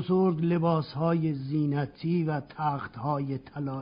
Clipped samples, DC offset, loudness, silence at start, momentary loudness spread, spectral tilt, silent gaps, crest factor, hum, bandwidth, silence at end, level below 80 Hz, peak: under 0.1%; under 0.1%; -29 LUFS; 0 s; 7 LU; -8 dB/octave; none; 14 dB; none; 5.2 kHz; 0 s; -62 dBFS; -14 dBFS